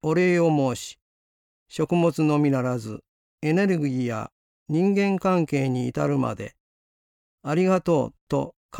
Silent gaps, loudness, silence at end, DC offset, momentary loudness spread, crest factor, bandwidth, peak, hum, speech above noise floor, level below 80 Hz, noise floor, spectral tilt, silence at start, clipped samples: 1.02-1.66 s, 3.08-3.38 s, 4.32-4.66 s, 6.60-7.38 s, 8.21-8.27 s, 8.56-8.69 s; -24 LUFS; 0 s; under 0.1%; 15 LU; 14 dB; 16 kHz; -10 dBFS; none; over 67 dB; -60 dBFS; under -90 dBFS; -7 dB/octave; 0.05 s; under 0.1%